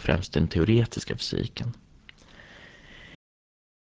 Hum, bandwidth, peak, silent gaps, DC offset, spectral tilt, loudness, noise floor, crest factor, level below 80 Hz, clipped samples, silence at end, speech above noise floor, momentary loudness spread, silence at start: none; 8 kHz; -8 dBFS; none; under 0.1%; -6.5 dB/octave; -27 LUFS; -52 dBFS; 20 dB; -42 dBFS; under 0.1%; 0.65 s; 27 dB; 25 LU; 0 s